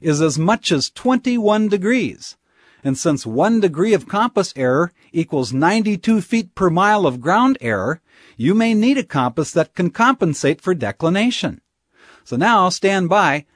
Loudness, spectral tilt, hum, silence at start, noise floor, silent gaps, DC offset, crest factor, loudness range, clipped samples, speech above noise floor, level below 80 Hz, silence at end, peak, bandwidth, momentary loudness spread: -17 LUFS; -5.5 dB/octave; none; 0 s; -51 dBFS; none; under 0.1%; 16 dB; 2 LU; under 0.1%; 34 dB; -56 dBFS; 0.15 s; -2 dBFS; 11 kHz; 7 LU